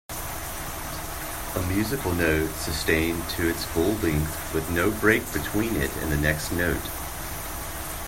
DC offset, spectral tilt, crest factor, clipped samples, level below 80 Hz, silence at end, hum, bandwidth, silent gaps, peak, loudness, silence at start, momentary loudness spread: under 0.1%; -4.5 dB/octave; 20 dB; under 0.1%; -38 dBFS; 0 s; none; 16.5 kHz; none; -6 dBFS; -26 LUFS; 0.1 s; 9 LU